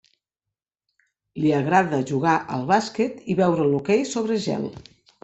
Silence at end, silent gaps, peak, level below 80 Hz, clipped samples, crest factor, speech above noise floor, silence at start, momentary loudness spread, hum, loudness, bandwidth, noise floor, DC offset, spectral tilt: 0.45 s; none; -4 dBFS; -62 dBFS; under 0.1%; 20 dB; 65 dB; 1.35 s; 7 LU; none; -22 LUFS; 8.2 kHz; -87 dBFS; under 0.1%; -6 dB/octave